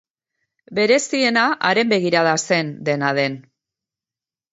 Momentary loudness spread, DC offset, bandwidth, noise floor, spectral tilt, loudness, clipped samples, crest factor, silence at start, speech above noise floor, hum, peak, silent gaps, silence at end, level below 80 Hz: 7 LU; under 0.1%; 8 kHz; under -90 dBFS; -4 dB/octave; -18 LUFS; under 0.1%; 18 dB; 0.7 s; over 72 dB; none; -2 dBFS; none; 1.1 s; -70 dBFS